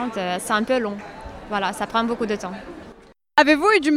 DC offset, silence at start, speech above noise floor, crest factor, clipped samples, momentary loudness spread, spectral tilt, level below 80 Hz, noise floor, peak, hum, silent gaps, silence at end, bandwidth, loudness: under 0.1%; 0 s; 26 dB; 20 dB; under 0.1%; 21 LU; -4 dB/octave; -50 dBFS; -47 dBFS; -2 dBFS; none; none; 0 s; 16 kHz; -21 LUFS